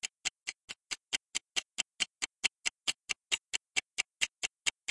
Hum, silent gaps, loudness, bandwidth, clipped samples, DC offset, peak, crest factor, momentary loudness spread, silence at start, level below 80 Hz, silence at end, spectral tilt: none; 0.64-0.68 s; -35 LUFS; 11.5 kHz; under 0.1%; under 0.1%; -12 dBFS; 26 dB; 7 LU; 0.05 s; -76 dBFS; 0.2 s; 2.5 dB/octave